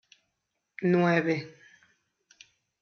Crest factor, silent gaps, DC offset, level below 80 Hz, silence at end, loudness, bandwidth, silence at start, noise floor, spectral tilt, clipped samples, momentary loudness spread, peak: 22 dB; none; under 0.1%; -78 dBFS; 1.3 s; -26 LUFS; 6.6 kHz; 0.8 s; -81 dBFS; -6 dB/octave; under 0.1%; 24 LU; -10 dBFS